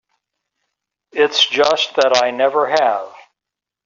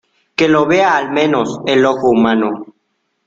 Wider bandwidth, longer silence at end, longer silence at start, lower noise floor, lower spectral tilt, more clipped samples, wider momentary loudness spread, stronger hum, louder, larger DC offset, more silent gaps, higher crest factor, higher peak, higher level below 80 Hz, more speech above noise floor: about the same, 7.6 kHz vs 7.8 kHz; about the same, 0.65 s vs 0.65 s; first, 1.15 s vs 0.4 s; first, -85 dBFS vs -67 dBFS; second, 1 dB/octave vs -5.5 dB/octave; neither; first, 10 LU vs 7 LU; neither; about the same, -15 LUFS vs -13 LUFS; neither; neither; about the same, 16 dB vs 14 dB; about the same, -2 dBFS vs 0 dBFS; second, -66 dBFS vs -54 dBFS; first, 70 dB vs 54 dB